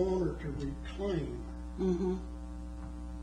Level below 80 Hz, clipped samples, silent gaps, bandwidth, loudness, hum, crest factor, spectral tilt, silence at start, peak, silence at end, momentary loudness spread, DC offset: -42 dBFS; under 0.1%; none; 10.5 kHz; -37 LUFS; none; 16 dB; -8 dB/octave; 0 s; -20 dBFS; 0 s; 12 LU; under 0.1%